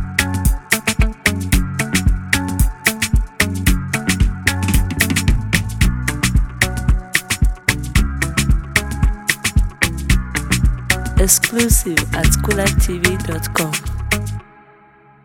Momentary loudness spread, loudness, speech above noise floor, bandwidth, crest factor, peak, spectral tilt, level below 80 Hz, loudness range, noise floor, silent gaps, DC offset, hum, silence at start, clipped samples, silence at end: 4 LU; -17 LUFS; 31 dB; 19 kHz; 16 dB; 0 dBFS; -4 dB/octave; -20 dBFS; 2 LU; -47 dBFS; none; under 0.1%; none; 0 s; under 0.1%; 0.8 s